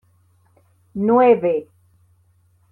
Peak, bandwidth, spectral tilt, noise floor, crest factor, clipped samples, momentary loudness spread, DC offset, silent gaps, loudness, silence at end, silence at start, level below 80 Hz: -4 dBFS; 4 kHz; -9.5 dB/octave; -58 dBFS; 18 dB; under 0.1%; 13 LU; under 0.1%; none; -17 LUFS; 1.1 s; 0.95 s; -66 dBFS